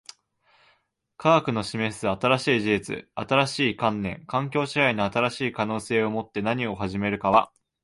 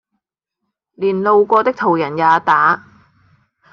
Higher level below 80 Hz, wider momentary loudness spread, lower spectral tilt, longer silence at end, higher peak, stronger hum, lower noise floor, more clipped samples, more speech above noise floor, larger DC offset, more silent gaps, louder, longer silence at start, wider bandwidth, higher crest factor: first, -56 dBFS vs -64 dBFS; about the same, 7 LU vs 8 LU; second, -5.5 dB/octave vs -7 dB/octave; second, 0.35 s vs 0.95 s; about the same, -4 dBFS vs -2 dBFS; neither; second, -68 dBFS vs -78 dBFS; neither; second, 43 dB vs 64 dB; neither; neither; second, -24 LUFS vs -14 LUFS; first, 1.2 s vs 1 s; first, 11.5 kHz vs 6.8 kHz; about the same, 20 dB vs 16 dB